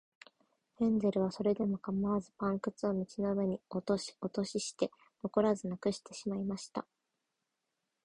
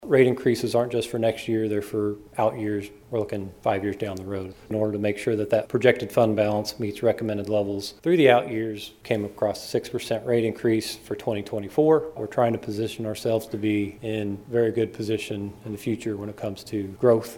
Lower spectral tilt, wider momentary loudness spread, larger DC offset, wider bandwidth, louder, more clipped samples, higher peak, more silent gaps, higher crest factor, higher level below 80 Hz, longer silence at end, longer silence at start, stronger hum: about the same, -6 dB/octave vs -6 dB/octave; second, 8 LU vs 11 LU; neither; second, 11 kHz vs 17 kHz; second, -35 LUFS vs -25 LUFS; neither; second, -16 dBFS vs -2 dBFS; neither; about the same, 20 dB vs 22 dB; second, -68 dBFS vs -58 dBFS; first, 1.25 s vs 0 s; first, 0.8 s vs 0 s; neither